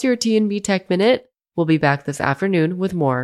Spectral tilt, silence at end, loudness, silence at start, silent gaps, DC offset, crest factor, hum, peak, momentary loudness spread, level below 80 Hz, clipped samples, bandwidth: -5.5 dB/octave; 0 s; -19 LUFS; 0 s; none; under 0.1%; 16 dB; none; -4 dBFS; 5 LU; -56 dBFS; under 0.1%; 13 kHz